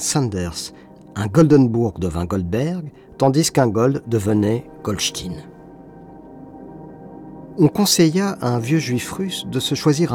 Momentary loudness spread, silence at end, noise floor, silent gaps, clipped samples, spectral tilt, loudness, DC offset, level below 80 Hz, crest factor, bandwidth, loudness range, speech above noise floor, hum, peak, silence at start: 23 LU; 0 s; -41 dBFS; none; under 0.1%; -5.5 dB/octave; -19 LUFS; under 0.1%; -48 dBFS; 16 dB; 18 kHz; 6 LU; 22 dB; none; -4 dBFS; 0 s